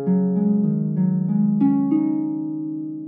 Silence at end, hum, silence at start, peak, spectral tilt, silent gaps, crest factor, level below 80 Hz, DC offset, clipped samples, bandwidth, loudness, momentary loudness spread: 0 s; none; 0 s; -8 dBFS; -14.5 dB/octave; none; 12 dB; -66 dBFS; under 0.1%; under 0.1%; 2.4 kHz; -21 LUFS; 8 LU